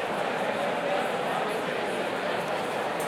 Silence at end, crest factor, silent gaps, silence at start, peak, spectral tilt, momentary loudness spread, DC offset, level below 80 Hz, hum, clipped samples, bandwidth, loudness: 0 s; 14 dB; none; 0 s; -16 dBFS; -4 dB/octave; 2 LU; under 0.1%; -68 dBFS; none; under 0.1%; 16.5 kHz; -29 LUFS